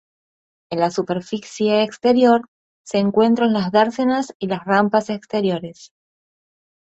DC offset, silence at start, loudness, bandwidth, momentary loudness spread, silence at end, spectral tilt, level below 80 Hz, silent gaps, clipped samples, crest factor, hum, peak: under 0.1%; 0.7 s; -19 LUFS; 8.2 kHz; 10 LU; 0.95 s; -6 dB/octave; -62 dBFS; 2.48-2.85 s, 4.35-4.40 s; under 0.1%; 18 dB; none; -2 dBFS